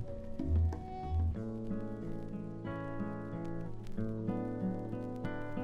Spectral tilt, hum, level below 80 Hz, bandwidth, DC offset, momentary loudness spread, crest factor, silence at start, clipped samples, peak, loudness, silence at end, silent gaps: -9.5 dB/octave; none; -44 dBFS; 6.2 kHz; under 0.1%; 8 LU; 16 dB; 0 s; under 0.1%; -22 dBFS; -39 LUFS; 0 s; none